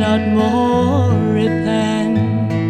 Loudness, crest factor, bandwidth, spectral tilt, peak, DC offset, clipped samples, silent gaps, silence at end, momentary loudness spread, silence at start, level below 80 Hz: -16 LUFS; 12 dB; 9.4 kHz; -7.5 dB/octave; -4 dBFS; under 0.1%; under 0.1%; none; 0 s; 2 LU; 0 s; -44 dBFS